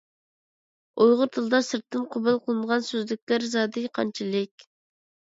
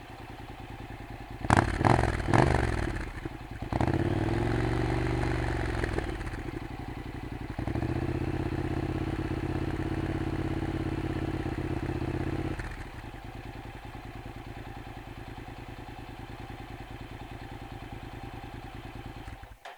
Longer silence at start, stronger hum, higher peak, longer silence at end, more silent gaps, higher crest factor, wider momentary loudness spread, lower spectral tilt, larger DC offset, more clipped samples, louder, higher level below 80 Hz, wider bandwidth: first, 0.95 s vs 0 s; neither; second, -8 dBFS vs -4 dBFS; first, 0.7 s vs 0 s; first, 3.22-3.27 s, 4.51-4.58 s vs none; second, 18 dB vs 28 dB; second, 9 LU vs 17 LU; second, -4.5 dB/octave vs -7 dB/octave; neither; neither; first, -25 LUFS vs -32 LUFS; second, -74 dBFS vs -40 dBFS; second, 7.8 kHz vs 19 kHz